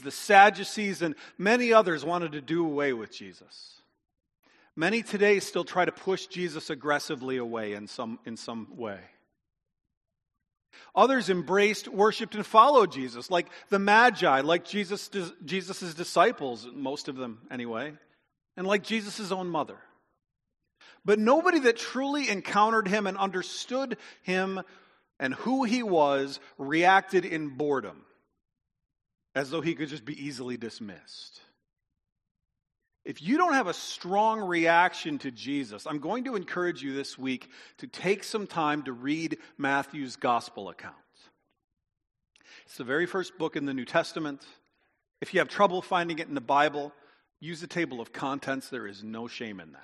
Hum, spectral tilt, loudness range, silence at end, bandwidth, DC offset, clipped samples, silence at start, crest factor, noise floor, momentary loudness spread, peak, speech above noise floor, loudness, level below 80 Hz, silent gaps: none; -4.5 dB/octave; 11 LU; 0.1 s; 11.5 kHz; under 0.1%; under 0.1%; 0 s; 26 dB; -74 dBFS; 17 LU; -4 dBFS; 46 dB; -27 LUFS; -78 dBFS; 4.39-4.43 s, 9.97-10.01 s, 32.31-32.35 s, 41.64-41.68 s